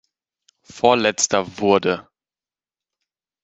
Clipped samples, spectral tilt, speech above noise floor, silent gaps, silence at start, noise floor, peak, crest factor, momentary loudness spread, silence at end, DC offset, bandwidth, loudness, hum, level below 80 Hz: under 0.1%; -3 dB/octave; over 72 dB; none; 0.75 s; under -90 dBFS; -2 dBFS; 20 dB; 6 LU; 1.45 s; under 0.1%; 8.4 kHz; -19 LUFS; none; -64 dBFS